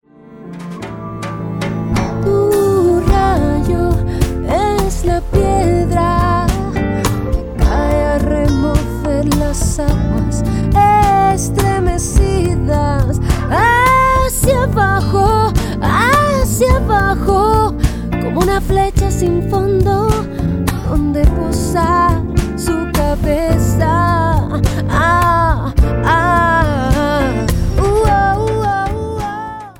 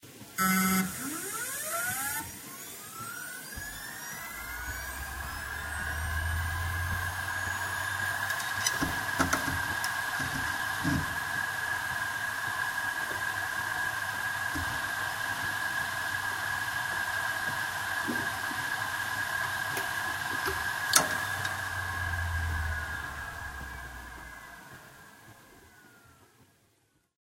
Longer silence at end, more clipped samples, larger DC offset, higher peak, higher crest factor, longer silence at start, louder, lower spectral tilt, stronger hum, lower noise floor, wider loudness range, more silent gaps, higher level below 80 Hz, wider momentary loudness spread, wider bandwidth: second, 0.1 s vs 0.8 s; neither; neither; about the same, 0 dBFS vs -2 dBFS; second, 12 dB vs 30 dB; first, 0.3 s vs 0 s; first, -14 LUFS vs -31 LUFS; first, -6 dB/octave vs -2.5 dB/octave; neither; second, -35 dBFS vs -71 dBFS; second, 3 LU vs 8 LU; neither; first, -20 dBFS vs -48 dBFS; second, 6 LU vs 11 LU; first, 18.5 kHz vs 16 kHz